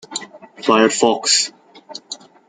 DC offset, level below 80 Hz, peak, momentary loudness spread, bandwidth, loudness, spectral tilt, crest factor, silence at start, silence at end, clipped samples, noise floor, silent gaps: under 0.1%; -68 dBFS; -2 dBFS; 20 LU; 9.6 kHz; -15 LUFS; -2 dB/octave; 18 dB; 0.1 s; 0.3 s; under 0.1%; -39 dBFS; none